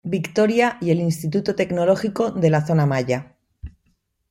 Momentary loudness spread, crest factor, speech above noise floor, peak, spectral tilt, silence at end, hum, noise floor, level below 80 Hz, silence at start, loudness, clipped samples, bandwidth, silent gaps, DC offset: 5 LU; 16 dB; 48 dB; -4 dBFS; -7 dB/octave; 0.6 s; none; -67 dBFS; -50 dBFS; 0.05 s; -20 LUFS; under 0.1%; 16 kHz; none; under 0.1%